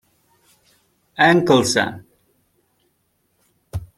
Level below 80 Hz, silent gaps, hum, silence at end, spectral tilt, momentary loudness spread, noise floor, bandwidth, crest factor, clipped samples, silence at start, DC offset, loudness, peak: -50 dBFS; none; none; 0.15 s; -4.5 dB/octave; 21 LU; -67 dBFS; 15 kHz; 20 dB; under 0.1%; 1.2 s; under 0.1%; -16 LUFS; -2 dBFS